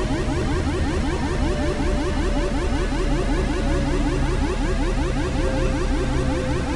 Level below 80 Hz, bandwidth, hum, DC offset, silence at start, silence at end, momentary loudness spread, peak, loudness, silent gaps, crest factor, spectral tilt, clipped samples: -24 dBFS; 11.5 kHz; none; under 0.1%; 0 s; 0 s; 1 LU; -10 dBFS; -23 LUFS; none; 12 dB; -6 dB/octave; under 0.1%